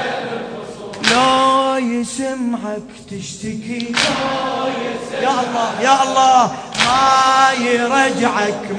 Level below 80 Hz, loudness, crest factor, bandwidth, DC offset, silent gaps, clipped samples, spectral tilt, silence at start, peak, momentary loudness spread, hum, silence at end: -52 dBFS; -15 LUFS; 16 dB; 10.5 kHz; under 0.1%; none; under 0.1%; -3 dB/octave; 0 s; 0 dBFS; 15 LU; none; 0 s